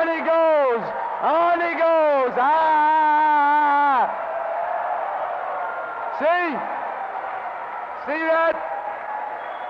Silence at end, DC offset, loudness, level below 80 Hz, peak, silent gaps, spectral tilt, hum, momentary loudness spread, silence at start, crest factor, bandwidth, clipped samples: 0 s; under 0.1%; -21 LUFS; -70 dBFS; -12 dBFS; none; -5.5 dB/octave; none; 12 LU; 0 s; 10 dB; 6 kHz; under 0.1%